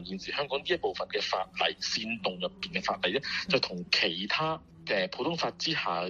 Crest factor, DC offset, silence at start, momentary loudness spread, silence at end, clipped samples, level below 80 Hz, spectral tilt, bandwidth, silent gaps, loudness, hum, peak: 24 dB; under 0.1%; 0 s; 6 LU; 0 s; under 0.1%; -62 dBFS; -3.5 dB/octave; 8 kHz; none; -30 LUFS; none; -8 dBFS